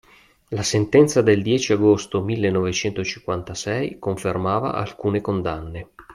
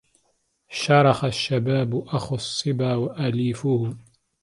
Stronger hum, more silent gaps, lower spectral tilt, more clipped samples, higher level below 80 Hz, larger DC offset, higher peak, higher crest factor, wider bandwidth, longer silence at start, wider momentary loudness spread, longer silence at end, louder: neither; neither; about the same, -5.5 dB/octave vs -6 dB/octave; neither; first, -50 dBFS vs -58 dBFS; neither; about the same, -2 dBFS vs -2 dBFS; about the same, 18 dB vs 20 dB; about the same, 12.5 kHz vs 11.5 kHz; second, 0.5 s vs 0.7 s; about the same, 12 LU vs 11 LU; second, 0 s vs 0.4 s; about the same, -21 LUFS vs -23 LUFS